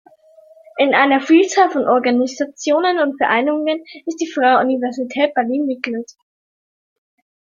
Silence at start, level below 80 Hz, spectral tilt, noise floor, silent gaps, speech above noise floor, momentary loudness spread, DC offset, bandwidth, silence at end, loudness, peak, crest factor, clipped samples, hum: 0.75 s; -68 dBFS; -3.5 dB/octave; -47 dBFS; none; 31 dB; 12 LU; under 0.1%; 7.6 kHz; 1.55 s; -16 LUFS; -2 dBFS; 16 dB; under 0.1%; none